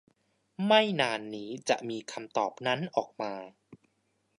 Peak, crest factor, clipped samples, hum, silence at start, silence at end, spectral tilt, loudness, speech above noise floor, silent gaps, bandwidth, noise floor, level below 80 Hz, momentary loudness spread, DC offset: -8 dBFS; 24 dB; under 0.1%; none; 0.6 s; 0.65 s; -4 dB/octave; -30 LUFS; 45 dB; none; 11 kHz; -75 dBFS; -80 dBFS; 14 LU; under 0.1%